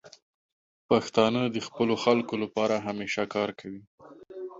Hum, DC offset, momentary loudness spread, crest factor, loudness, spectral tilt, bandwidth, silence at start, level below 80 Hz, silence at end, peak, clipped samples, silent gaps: none; under 0.1%; 18 LU; 20 dB; -27 LUFS; -5.5 dB/octave; 7.8 kHz; 0.05 s; -66 dBFS; 0 s; -8 dBFS; under 0.1%; 0.22-0.89 s, 3.87-3.98 s